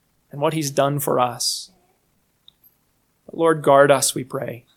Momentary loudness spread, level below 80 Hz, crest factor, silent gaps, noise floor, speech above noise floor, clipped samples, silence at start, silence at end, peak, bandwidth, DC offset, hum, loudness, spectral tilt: 15 LU; -66 dBFS; 22 dB; none; -66 dBFS; 47 dB; under 0.1%; 0.35 s; 0.2 s; 0 dBFS; 19 kHz; under 0.1%; none; -19 LUFS; -4 dB/octave